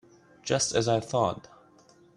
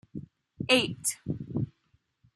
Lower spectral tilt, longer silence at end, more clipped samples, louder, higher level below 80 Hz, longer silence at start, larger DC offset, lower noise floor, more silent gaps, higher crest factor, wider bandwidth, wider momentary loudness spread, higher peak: about the same, -4 dB/octave vs -3.5 dB/octave; about the same, 0.75 s vs 0.65 s; neither; about the same, -27 LUFS vs -29 LUFS; about the same, -62 dBFS vs -62 dBFS; first, 0.45 s vs 0.15 s; neither; second, -58 dBFS vs -71 dBFS; neither; about the same, 20 dB vs 24 dB; second, 11.5 kHz vs 14 kHz; second, 14 LU vs 18 LU; about the same, -10 dBFS vs -8 dBFS